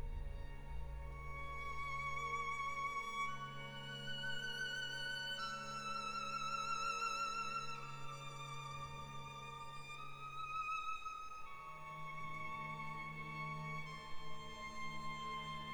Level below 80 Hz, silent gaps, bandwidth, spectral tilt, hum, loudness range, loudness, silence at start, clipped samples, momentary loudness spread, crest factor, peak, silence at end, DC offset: -56 dBFS; none; 19 kHz; -3 dB/octave; none; 5 LU; -45 LUFS; 0 s; under 0.1%; 10 LU; 14 dB; -30 dBFS; 0 s; under 0.1%